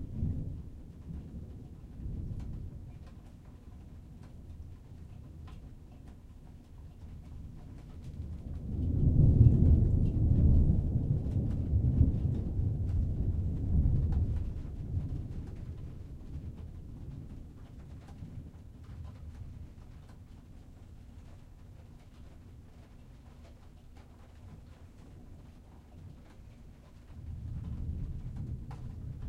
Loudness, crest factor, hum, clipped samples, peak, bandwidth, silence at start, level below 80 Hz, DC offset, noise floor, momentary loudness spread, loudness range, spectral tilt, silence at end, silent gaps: -32 LUFS; 24 dB; none; under 0.1%; -10 dBFS; 4.1 kHz; 0 s; -38 dBFS; under 0.1%; -53 dBFS; 26 LU; 26 LU; -10.5 dB/octave; 0 s; none